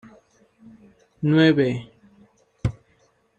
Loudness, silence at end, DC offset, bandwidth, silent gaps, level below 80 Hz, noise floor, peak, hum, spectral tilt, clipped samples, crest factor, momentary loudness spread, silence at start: -21 LUFS; 0.65 s; under 0.1%; 8.4 kHz; none; -48 dBFS; -63 dBFS; -4 dBFS; none; -8 dB/octave; under 0.1%; 20 dB; 13 LU; 1.2 s